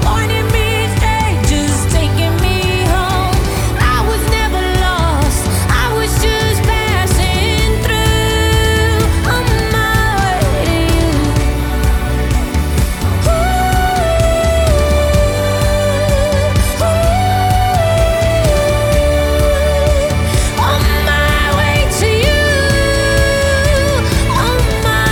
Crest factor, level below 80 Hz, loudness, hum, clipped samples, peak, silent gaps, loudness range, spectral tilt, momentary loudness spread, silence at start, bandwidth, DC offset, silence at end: 12 dB; -18 dBFS; -13 LUFS; none; under 0.1%; 0 dBFS; none; 2 LU; -5 dB/octave; 2 LU; 0 s; 20 kHz; under 0.1%; 0 s